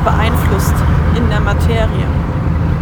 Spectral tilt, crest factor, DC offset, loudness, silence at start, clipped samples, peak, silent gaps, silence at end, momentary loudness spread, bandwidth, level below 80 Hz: -7 dB/octave; 12 dB; under 0.1%; -14 LUFS; 0 s; under 0.1%; 0 dBFS; none; 0 s; 3 LU; over 20 kHz; -18 dBFS